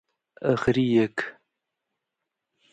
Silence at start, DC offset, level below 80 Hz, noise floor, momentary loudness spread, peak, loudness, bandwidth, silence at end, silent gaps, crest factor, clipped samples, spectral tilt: 0.4 s; under 0.1%; -56 dBFS; -84 dBFS; 11 LU; -6 dBFS; -24 LUFS; 9 kHz; 1.4 s; none; 20 dB; under 0.1%; -7 dB/octave